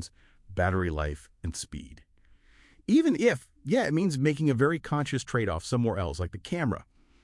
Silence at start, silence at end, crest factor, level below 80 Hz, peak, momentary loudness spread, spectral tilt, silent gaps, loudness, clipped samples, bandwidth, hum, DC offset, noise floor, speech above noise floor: 0 s; 0.4 s; 18 dB; -48 dBFS; -10 dBFS; 14 LU; -6.5 dB/octave; none; -28 LUFS; under 0.1%; 12 kHz; none; under 0.1%; -59 dBFS; 32 dB